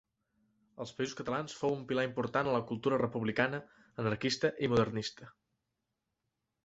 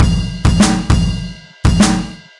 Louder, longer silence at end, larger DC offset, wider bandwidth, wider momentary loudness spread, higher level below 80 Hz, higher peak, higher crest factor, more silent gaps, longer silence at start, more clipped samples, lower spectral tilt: second, -34 LUFS vs -14 LUFS; first, 1.35 s vs 0.2 s; neither; second, 8 kHz vs 11.5 kHz; about the same, 10 LU vs 9 LU; second, -64 dBFS vs -20 dBFS; second, -14 dBFS vs -2 dBFS; first, 22 dB vs 12 dB; neither; first, 0.8 s vs 0 s; neither; about the same, -5.5 dB/octave vs -5 dB/octave